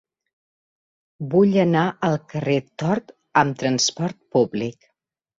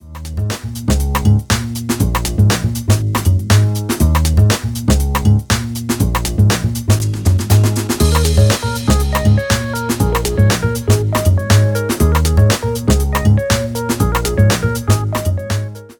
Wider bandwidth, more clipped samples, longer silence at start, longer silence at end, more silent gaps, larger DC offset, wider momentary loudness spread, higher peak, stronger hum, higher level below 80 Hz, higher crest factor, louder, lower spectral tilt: second, 7.8 kHz vs 19.5 kHz; neither; first, 1.2 s vs 0.05 s; first, 0.7 s vs 0.05 s; neither; neither; first, 10 LU vs 6 LU; about the same, -2 dBFS vs 0 dBFS; neither; second, -62 dBFS vs -22 dBFS; first, 20 dB vs 14 dB; second, -21 LUFS vs -15 LUFS; about the same, -5 dB/octave vs -5.5 dB/octave